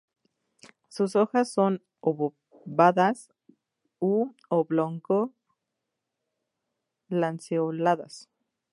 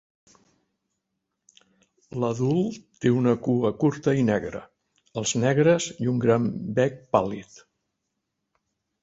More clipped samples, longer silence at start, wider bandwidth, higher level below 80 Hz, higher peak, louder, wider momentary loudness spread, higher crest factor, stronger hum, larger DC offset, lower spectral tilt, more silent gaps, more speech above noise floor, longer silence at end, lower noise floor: neither; second, 0.95 s vs 2.15 s; first, 11.5 kHz vs 8 kHz; second, -82 dBFS vs -60 dBFS; about the same, -6 dBFS vs -4 dBFS; about the same, -26 LUFS vs -24 LUFS; about the same, 10 LU vs 11 LU; about the same, 22 dB vs 22 dB; neither; neither; about the same, -7 dB/octave vs -6 dB/octave; neither; about the same, 59 dB vs 57 dB; second, 0.55 s vs 1.6 s; first, -84 dBFS vs -80 dBFS